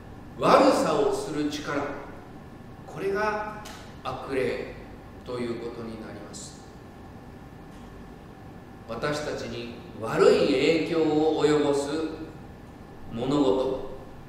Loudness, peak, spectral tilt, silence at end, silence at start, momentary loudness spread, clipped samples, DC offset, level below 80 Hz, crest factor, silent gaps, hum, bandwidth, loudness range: -26 LUFS; -4 dBFS; -5.5 dB/octave; 0 s; 0 s; 24 LU; under 0.1%; under 0.1%; -50 dBFS; 24 dB; none; none; 15.5 kHz; 14 LU